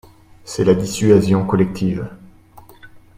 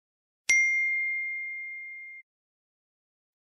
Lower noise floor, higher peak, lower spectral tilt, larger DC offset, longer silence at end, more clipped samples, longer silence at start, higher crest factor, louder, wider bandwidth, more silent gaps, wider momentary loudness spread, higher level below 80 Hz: second, -44 dBFS vs under -90 dBFS; first, 0 dBFS vs -6 dBFS; first, -7 dB/octave vs 3.5 dB/octave; neither; second, 0.2 s vs 1.25 s; neither; about the same, 0.45 s vs 0.5 s; second, 18 dB vs 26 dB; first, -17 LUFS vs -26 LUFS; first, 15.5 kHz vs 13.5 kHz; neither; second, 14 LU vs 18 LU; first, -46 dBFS vs -78 dBFS